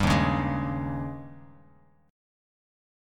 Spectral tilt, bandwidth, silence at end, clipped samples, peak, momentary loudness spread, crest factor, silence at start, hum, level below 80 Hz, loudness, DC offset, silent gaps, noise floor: -6.5 dB/octave; 15 kHz; 1 s; under 0.1%; -10 dBFS; 18 LU; 20 dB; 0 s; none; -42 dBFS; -28 LUFS; under 0.1%; none; -59 dBFS